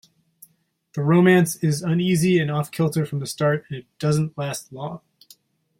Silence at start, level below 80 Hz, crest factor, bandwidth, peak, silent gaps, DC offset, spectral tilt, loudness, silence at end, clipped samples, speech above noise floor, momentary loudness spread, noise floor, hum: 0.95 s; -60 dBFS; 18 dB; 16.5 kHz; -6 dBFS; none; under 0.1%; -6 dB/octave; -21 LUFS; 0.85 s; under 0.1%; 42 dB; 17 LU; -63 dBFS; none